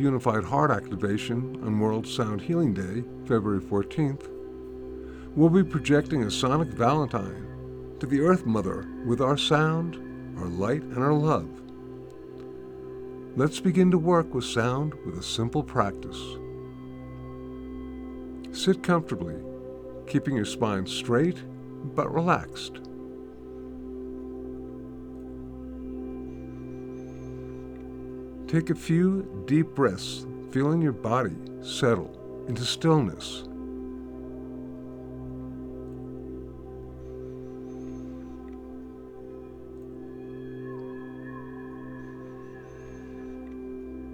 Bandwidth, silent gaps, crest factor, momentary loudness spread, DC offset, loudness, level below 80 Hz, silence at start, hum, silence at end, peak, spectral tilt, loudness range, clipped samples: 14 kHz; none; 22 dB; 18 LU; under 0.1%; -27 LUFS; -50 dBFS; 0 s; none; 0 s; -6 dBFS; -6.5 dB/octave; 14 LU; under 0.1%